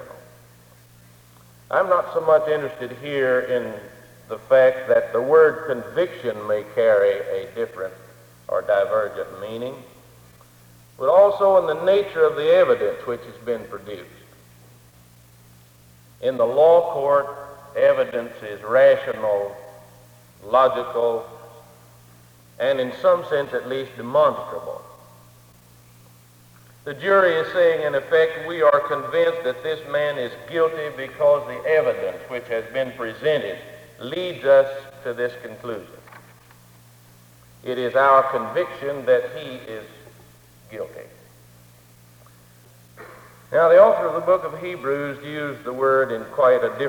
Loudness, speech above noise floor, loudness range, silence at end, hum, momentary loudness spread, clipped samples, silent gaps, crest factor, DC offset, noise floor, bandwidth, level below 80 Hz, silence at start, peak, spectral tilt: -20 LUFS; 31 dB; 8 LU; 0 s; none; 18 LU; under 0.1%; none; 20 dB; under 0.1%; -51 dBFS; 19 kHz; -62 dBFS; 0 s; -2 dBFS; -5.5 dB/octave